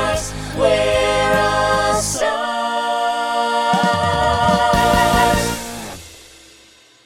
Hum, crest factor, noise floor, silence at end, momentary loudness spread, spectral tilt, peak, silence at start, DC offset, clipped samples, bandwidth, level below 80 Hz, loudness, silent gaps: none; 16 dB; -48 dBFS; 0.85 s; 9 LU; -3.5 dB/octave; -2 dBFS; 0 s; under 0.1%; under 0.1%; 17.5 kHz; -34 dBFS; -17 LUFS; none